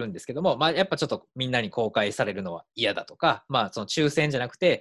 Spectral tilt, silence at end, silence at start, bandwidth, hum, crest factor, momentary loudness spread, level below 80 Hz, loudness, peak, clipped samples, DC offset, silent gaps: -4.5 dB/octave; 0 s; 0 s; 12.5 kHz; none; 18 dB; 7 LU; -62 dBFS; -26 LUFS; -8 dBFS; under 0.1%; under 0.1%; none